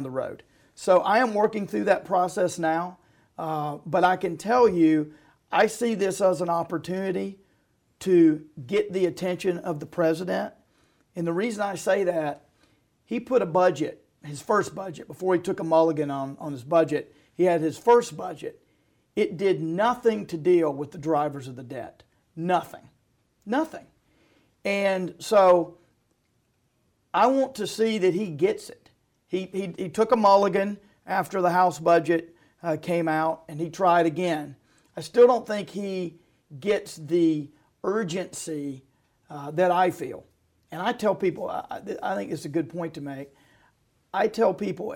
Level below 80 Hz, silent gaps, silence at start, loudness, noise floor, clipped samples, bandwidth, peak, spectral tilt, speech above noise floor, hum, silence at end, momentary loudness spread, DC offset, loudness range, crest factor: -66 dBFS; none; 0 s; -25 LUFS; -70 dBFS; under 0.1%; 17 kHz; -8 dBFS; -6 dB/octave; 46 dB; none; 0 s; 16 LU; under 0.1%; 5 LU; 18 dB